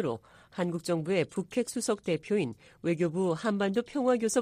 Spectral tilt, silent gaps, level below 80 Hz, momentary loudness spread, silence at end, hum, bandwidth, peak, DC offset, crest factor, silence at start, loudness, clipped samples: -5.5 dB/octave; none; -68 dBFS; 6 LU; 0 s; none; 15.5 kHz; -12 dBFS; under 0.1%; 18 dB; 0 s; -31 LUFS; under 0.1%